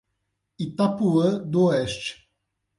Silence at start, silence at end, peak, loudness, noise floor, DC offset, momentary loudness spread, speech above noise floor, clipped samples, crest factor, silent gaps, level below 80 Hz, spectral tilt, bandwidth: 0.6 s; 0.65 s; -10 dBFS; -23 LUFS; -77 dBFS; under 0.1%; 12 LU; 55 dB; under 0.1%; 14 dB; none; -58 dBFS; -6.5 dB/octave; 11.5 kHz